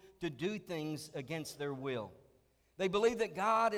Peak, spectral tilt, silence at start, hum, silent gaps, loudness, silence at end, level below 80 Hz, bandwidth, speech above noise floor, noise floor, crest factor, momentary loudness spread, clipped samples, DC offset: -18 dBFS; -5 dB/octave; 0.05 s; none; none; -37 LUFS; 0 s; -70 dBFS; 16.5 kHz; 35 dB; -71 dBFS; 18 dB; 11 LU; under 0.1%; under 0.1%